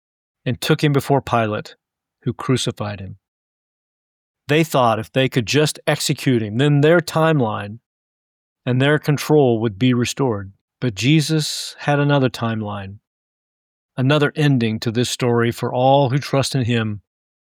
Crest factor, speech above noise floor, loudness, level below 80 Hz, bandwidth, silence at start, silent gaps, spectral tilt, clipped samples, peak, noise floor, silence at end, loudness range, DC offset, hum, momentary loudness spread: 16 dB; over 72 dB; -18 LUFS; -56 dBFS; 18.5 kHz; 0.45 s; 3.28-4.34 s, 7.86-8.56 s, 10.61-10.68 s, 13.07-13.89 s; -5.5 dB/octave; under 0.1%; -4 dBFS; under -90 dBFS; 0.5 s; 4 LU; under 0.1%; none; 13 LU